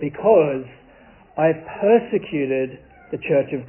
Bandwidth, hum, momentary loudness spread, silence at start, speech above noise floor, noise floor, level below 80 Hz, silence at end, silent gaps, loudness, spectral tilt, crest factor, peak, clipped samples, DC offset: 3.2 kHz; none; 15 LU; 0 s; 29 dB; -49 dBFS; -56 dBFS; 0 s; none; -20 LUFS; -11.5 dB/octave; 18 dB; -4 dBFS; under 0.1%; under 0.1%